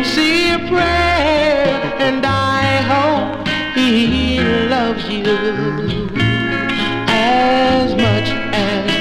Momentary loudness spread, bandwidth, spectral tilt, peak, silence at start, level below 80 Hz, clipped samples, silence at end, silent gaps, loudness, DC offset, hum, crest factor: 5 LU; 14.5 kHz; -5.5 dB/octave; -2 dBFS; 0 s; -34 dBFS; under 0.1%; 0 s; none; -15 LUFS; under 0.1%; none; 14 dB